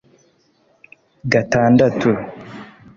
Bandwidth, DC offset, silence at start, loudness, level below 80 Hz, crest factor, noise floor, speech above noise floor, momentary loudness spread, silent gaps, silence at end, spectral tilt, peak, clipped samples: 7.2 kHz; under 0.1%; 1.25 s; -16 LUFS; -52 dBFS; 16 dB; -59 dBFS; 44 dB; 22 LU; none; 0.3 s; -7 dB/octave; -2 dBFS; under 0.1%